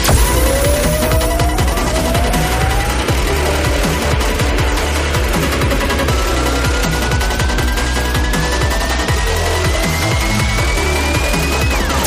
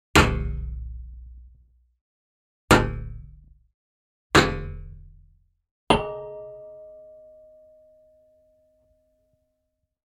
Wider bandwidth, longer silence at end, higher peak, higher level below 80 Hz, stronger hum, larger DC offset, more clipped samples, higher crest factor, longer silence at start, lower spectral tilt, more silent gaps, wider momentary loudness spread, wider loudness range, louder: about the same, 15.5 kHz vs 15.5 kHz; second, 0 s vs 3.15 s; about the same, -2 dBFS vs -4 dBFS; first, -18 dBFS vs -36 dBFS; neither; neither; neither; second, 14 dB vs 24 dB; second, 0 s vs 0.15 s; about the same, -4 dB/octave vs -4.5 dB/octave; second, none vs 2.01-2.68 s, 3.74-4.30 s, 5.71-5.87 s; second, 2 LU vs 25 LU; second, 1 LU vs 6 LU; first, -15 LUFS vs -23 LUFS